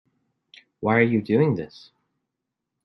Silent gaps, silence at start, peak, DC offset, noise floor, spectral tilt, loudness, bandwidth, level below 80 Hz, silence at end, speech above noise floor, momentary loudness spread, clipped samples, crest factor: none; 0.8 s; -6 dBFS; under 0.1%; -83 dBFS; -9.5 dB/octave; -22 LUFS; 6 kHz; -66 dBFS; 1.2 s; 62 dB; 10 LU; under 0.1%; 20 dB